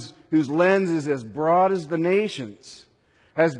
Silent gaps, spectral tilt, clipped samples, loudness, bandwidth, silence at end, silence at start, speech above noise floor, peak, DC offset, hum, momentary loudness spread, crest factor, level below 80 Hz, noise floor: none; -6.5 dB/octave; under 0.1%; -22 LUFS; 10.5 kHz; 0 s; 0 s; 39 dB; -6 dBFS; under 0.1%; none; 11 LU; 16 dB; -68 dBFS; -61 dBFS